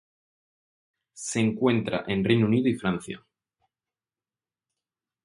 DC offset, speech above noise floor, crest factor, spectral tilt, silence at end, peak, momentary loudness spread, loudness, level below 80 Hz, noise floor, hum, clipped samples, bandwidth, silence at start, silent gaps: under 0.1%; over 65 dB; 22 dB; -6 dB/octave; 2.05 s; -6 dBFS; 14 LU; -25 LUFS; -60 dBFS; under -90 dBFS; none; under 0.1%; 11.5 kHz; 1.15 s; none